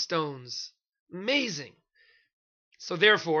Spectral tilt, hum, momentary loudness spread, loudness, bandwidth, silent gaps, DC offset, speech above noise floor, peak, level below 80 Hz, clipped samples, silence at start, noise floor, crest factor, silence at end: -3.5 dB/octave; none; 22 LU; -27 LUFS; 7.2 kHz; 1.00-1.07 s, 2.33-2.71 s; under 0.1%; 37 dB; -8 dBFS; -78 dBFS; under 0.1%; 0 s; -65 dBFS; 22 dB; 0 s